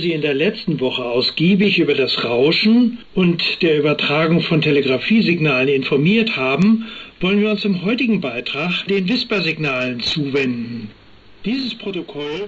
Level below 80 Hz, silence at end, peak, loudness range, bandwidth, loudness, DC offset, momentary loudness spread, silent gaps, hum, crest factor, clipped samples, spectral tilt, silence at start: -52 dBFS; 0 s; -6 dBFS; 5 LU; 7.8 kHz; -17 LUFS; under 0.1%; 8 LU; none; none; 10 dB; under 0.1%; -7 dB/octave; 0 s